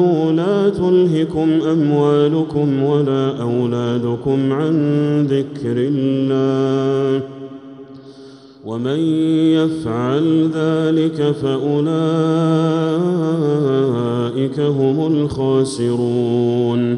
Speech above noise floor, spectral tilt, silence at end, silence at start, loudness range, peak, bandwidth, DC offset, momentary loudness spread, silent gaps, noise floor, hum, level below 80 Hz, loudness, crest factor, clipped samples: 24 dB; -8 dB/octave; 0 s; 0 s; 4 LU; -4 dBFS; 11 kHz; under 0.1%; 5 LU; none; -40 dBFS; none; -52 dBFS; -17 LUFS; 12 dB; under 0.1%